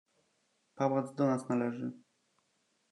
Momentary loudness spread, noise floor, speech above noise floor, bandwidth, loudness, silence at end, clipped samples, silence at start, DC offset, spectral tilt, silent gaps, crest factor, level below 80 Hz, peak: 9 LU; -77 dBFS; 44 dB; 10.5 kHz; -34 LUFS; 0.95 s; under 0.1%; 0.75 s; under 0.1%; -8 dB/octave; none; 20 dB; -86 dBFS; -16 dBFS